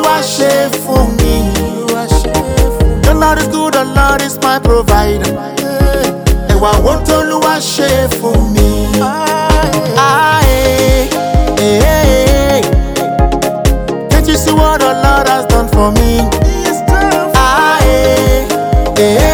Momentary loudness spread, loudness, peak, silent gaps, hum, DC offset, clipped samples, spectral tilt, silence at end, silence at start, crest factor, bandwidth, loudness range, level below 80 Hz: 4 LU; -10 LUFS; 0 dBFS; none; none; under 0.1%; under 0.1%; -5 dB/octave; 0 s; 0 s; 10 dB; over 20 kHz; 2 LU; -14 dBFS